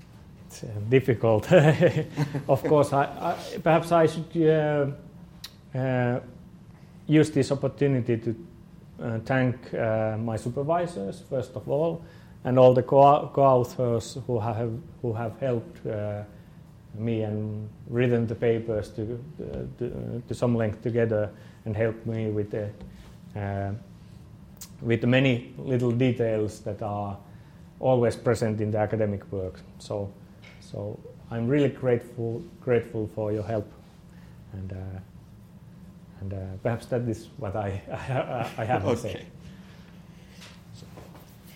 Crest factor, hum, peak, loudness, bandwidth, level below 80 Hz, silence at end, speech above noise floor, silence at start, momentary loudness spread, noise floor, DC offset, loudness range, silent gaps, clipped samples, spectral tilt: 22 dB; none; -4 dBFS; -26 LUFS; 16.5 kHz; -56 dBFS; 0 s; 23 dB; 0.1 s; 19 LU; -48 dBFS; under 0.1%; 10 LU; none; under 0.1%; -7.5 dB/octave